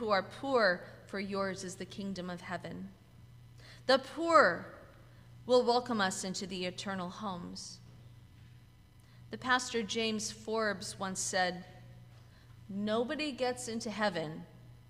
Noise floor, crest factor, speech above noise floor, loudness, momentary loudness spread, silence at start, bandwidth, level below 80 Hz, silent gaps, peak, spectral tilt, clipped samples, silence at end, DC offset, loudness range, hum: -59 dBFS; 24 dB; 25 dB; -33 LUFS; 18 LU; 0 s; 15.5 kHz; -66 dBFS; none; -10 dBFS; -3.5 dB/octave; under 0.1%; 0.1 s; under 0.1%; 8 LU; none